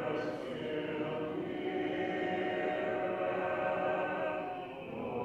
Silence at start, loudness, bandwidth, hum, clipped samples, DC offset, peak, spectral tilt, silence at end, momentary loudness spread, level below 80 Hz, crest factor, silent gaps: 0 s; -36 LUFS; 9.2 kHz; none; under 0.1%; under 0.1%; -22 dBFS; -7 dB/octave; 0 s; 6 LU; -70 dBFS; 14 dB; none